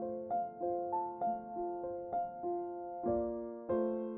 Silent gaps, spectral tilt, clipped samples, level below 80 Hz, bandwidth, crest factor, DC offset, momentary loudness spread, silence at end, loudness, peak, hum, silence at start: none; -5 dB/octave; under 0.1%; -64 dBFS; 3.4 kHz; 14 dB; under 0.1%; 5 LU; 0 s; -38 LUFS; -24 dBFS; none; 0 s